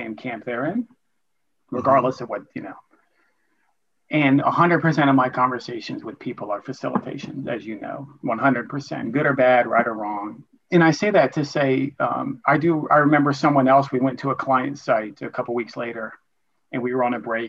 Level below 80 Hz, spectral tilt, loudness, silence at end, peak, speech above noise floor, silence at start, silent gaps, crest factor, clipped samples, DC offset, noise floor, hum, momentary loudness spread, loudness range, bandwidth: -68 dBFS; -7 dB/octave; -21 LUFS; 0 s; -4 dBFS; 57 dB; 0 s; none; 18 dB; under 0.1%; under 0.1%; -78 dBFS; none; 15 LU; 7 LU; 7.6 kHz